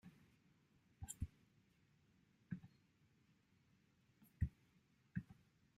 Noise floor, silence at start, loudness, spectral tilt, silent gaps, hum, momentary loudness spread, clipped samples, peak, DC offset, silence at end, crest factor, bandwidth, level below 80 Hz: -77 dBFS; 0.05 s; -52 LUFS; -5.5 dB/octave; none; none; 19 LU; under 0.1%; -28 dBFS; under 0.1%; 0.45 s; 26 dB; 15 kHz; -62 dBFS